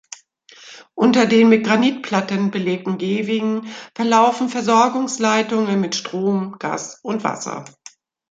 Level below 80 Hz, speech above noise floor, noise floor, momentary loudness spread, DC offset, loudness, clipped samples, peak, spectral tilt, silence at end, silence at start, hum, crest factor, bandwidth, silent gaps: -66 dBFS; 30 dB; -48 dBFS; 13 LU; under 0.1%; -18 LUFS; under 0.1%; -2 dBFS; -5 dB/octave; 0.6 s; 0.65 s; none; 18 dB; 8.6 kHz; none